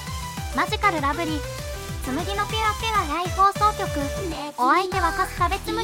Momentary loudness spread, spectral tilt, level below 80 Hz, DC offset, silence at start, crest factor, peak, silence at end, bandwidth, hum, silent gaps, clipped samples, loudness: 11 LU; -4 dB/octave; -36 dBFS; under 0.1%; 0 s; 16 dB; -8 dBFS; 0 s; 16.5 kHz; none; none; under 0.1%; -23 LUFS